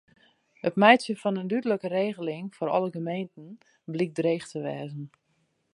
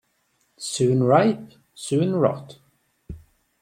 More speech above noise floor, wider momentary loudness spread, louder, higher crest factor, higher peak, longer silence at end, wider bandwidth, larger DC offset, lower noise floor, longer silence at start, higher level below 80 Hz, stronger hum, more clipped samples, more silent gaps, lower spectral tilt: about the same, 45 dB vs 47 dB; second, 18 LU vs 25 LU; second, -27 LUFS vs -21 LUFS; about the same, 24 dB vs 20 dB; about the same, -2 dBFS vs -4 dBFS; first, 0.65 s vs 0.45 s; second, 11.5 kHz vs 14.5 kHz; neither; first, -72 dBFS vs -68 dBFS; about the same, 0.65 s vs 0.6 s; second, -78 dBFS vs -54 dBFS; neither; neither; neither; about the same, -6 dB/octave vs -6 dB/octave